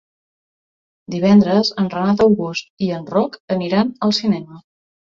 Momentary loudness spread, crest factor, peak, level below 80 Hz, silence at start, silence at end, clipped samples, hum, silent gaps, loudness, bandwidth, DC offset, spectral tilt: 10 LU; 16 dB; -2 dBFS; -54 dBFS; 1.1 s; 0.45 s; under 0.1%; none; 2.70-2.77 s, 3.40-3.48 s; -17 LUFS; 7.4 kHz; under 0.1%; -6.5 dB/octave